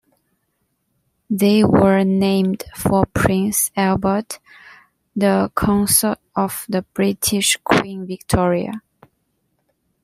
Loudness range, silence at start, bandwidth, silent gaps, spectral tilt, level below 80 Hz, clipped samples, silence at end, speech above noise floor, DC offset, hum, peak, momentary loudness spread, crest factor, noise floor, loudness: 3 LU; 1.3 s; 16 kHz; none; -4.5 dB/octave; -42 dBFS; under 0.1%; 1.25 s; 52 dB; under 0.1%; none; -2 dBFS; 11 LU; 18 dB; -70 dBFS; -17 LUFS